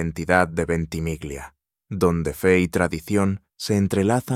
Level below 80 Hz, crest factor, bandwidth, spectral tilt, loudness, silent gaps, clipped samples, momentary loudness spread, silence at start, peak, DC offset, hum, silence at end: -42 dBFS; 20 dB; 16 kHz; -6 dB/octave; -22 LUFS; none; under 0.1%; 11 LU; 0 s; -2 dBFS; under 0.1%; none; 0 s